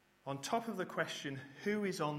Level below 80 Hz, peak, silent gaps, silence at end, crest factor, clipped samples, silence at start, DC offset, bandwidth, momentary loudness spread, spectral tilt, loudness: -78 dBFS; -20 dBFS; none; 0 s; 20 dB; under 0.1%; 0.25 s; under 0.1%; 16 kHz; 7 LU; -4.5 dB/octave; -40 LUFS